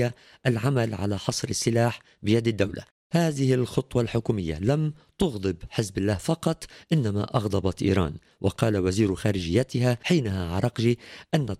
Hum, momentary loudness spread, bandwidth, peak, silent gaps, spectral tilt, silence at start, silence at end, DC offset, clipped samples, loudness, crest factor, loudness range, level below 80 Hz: none; 6 LU; 14 kHz; -8 dBFS; 2.91-3.10 s; -6 dB/octave; 0 s; 0.05 s; under 0.1%; under 0.1%; -26 LUFS; 18 dB; 2 LU; -48 dBFS